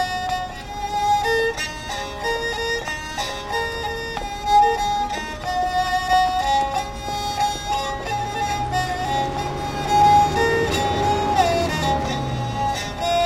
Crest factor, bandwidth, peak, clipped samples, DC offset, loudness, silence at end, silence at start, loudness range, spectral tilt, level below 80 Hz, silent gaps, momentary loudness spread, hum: 16 dB; 16 kHz; -6 dBFS; under 0.1%; under 0.1%; -21 LUFS; 0 s; 0 s; 4 LU; -4 dB/octave; -38 dBFS; none; 10 LU; none